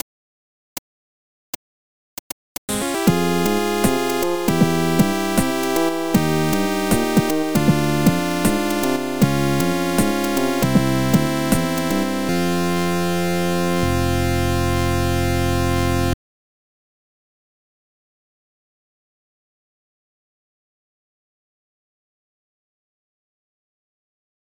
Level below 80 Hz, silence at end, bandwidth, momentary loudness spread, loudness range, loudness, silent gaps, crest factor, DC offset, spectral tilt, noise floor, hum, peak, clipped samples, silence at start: -42 dBFS; 8.4 s; over 20 kHz; 11 LU; 6 LU; -19 LUFS; 0.02-2.68 s; 18 dB; 3%; -5.5 dB/octave; under -90 dBFS; none; -2 dBFS; under 0.1%; 0 s